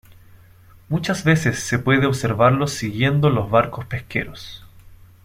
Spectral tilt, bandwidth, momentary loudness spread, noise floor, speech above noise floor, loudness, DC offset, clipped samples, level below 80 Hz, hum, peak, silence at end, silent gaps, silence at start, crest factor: -6 dB/octave; 15.5 kHz; 10 LU; -48 dBFS; 29 dB; -19 LUFS; under 0.1%; under 0.1%; -46 dBFS; none; -2 dBFS; 0.3 s; none; 0.9 s; 18 dB